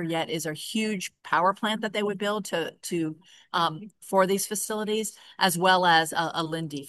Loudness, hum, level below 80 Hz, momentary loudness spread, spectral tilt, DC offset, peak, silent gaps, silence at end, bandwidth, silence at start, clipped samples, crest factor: -26 LUFS; none; -76 dBFS; 10 LU; -3.5 dB/octave; under 0.1%; -8 dBFS; none; 0 s; 13 kHz; 0 s; under 0.1%; 20 dB